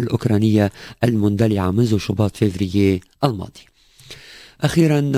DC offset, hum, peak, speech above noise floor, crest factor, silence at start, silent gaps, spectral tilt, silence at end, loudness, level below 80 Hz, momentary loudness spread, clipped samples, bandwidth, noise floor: under 0.1%; none; -2 dBFS; 25 dB; 16 dB; 0 s; none; -7 dB/octave; 0 s; -19 LUFS; -40 dBFS; 13 LU; under 0.1%; 16 kHz; -43 dBFS